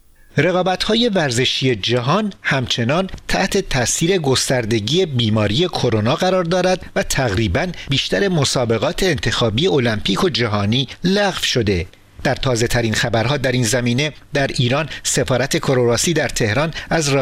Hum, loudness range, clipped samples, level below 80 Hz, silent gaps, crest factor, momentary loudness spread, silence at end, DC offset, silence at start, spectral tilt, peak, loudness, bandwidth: none; 1 LU; under 0.1%; -36 dBFS; none; 16 dB; 4 LU; 0 s; under 0.1%; 0.35 s; -4.5 dB/octave; 0 dBFS; -17 LUFS; 16 kHz